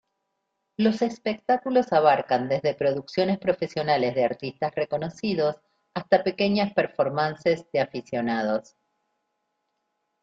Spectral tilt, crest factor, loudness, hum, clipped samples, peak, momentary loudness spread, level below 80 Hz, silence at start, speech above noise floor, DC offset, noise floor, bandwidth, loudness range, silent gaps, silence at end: -6.5 dB/octave; 20 dB; -25 LUFS; none; under 0.1%; -6 dBFS; 7 LU; -66 dBFS; 0.8 s; 54 dB; under 0.1%; -78 dBFS; 7.8 kHz; 3 LU; none; 1.6 s